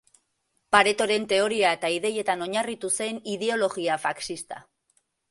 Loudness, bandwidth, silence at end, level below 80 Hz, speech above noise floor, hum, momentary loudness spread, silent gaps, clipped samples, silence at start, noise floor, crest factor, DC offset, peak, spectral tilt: -25 LUFS; 11.5 kHz; 0.7 s; -66 dBFS; 49 dB; none; 12 LU; none; under 0.1%; 0.7 s; -74 dBFS; 24 dB; under 0.1%; -2 dBFS; -2.5 dB/octave